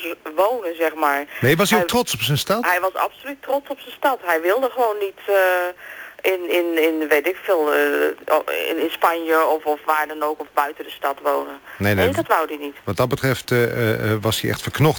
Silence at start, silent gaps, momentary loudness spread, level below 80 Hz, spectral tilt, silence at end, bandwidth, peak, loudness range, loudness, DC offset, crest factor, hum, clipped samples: 0 s; none; 8 LU; -54 dBFS; -5 dB/octave; 0 s; 19.5 kHz; -4 dBFS; 2 LU; -20 LUFS; under 0.1%; 16 dB; none; under 0.1%